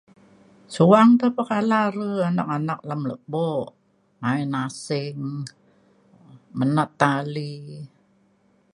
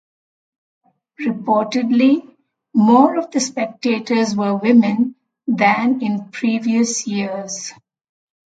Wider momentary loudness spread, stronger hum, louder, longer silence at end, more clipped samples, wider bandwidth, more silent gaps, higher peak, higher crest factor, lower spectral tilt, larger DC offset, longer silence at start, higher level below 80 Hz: first, 20 LU vs 11 LU; neither; second, -22 LUFS vs -17 LUFS; about the same, 0.85 s vs 0.75 s; neither; first, 11 kHz vs 9.2 kHz; neither; about the same, 0 dBFS vs 0 dBFS; about the same, 22 dB vs 18 dB; first, -7 dB/octave vs -4.5 dB/octave; neither; second, 0.7 s vs 1.2 s; about the same, -68 dBFS vs -66 dBFS